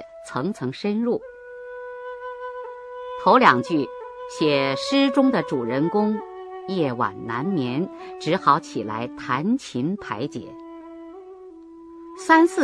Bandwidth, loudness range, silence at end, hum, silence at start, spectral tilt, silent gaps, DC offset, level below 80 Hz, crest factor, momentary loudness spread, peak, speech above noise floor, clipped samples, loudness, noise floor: 11 kHz; 8 LU; 0 s; none; 0 s; -6 dB/octave; none; under 0.1%; -64 dBFS; 22 dB; 22 LU; 0 dBFS; 21 dB; under 0.1%; -22 LUFS; -43 dBFS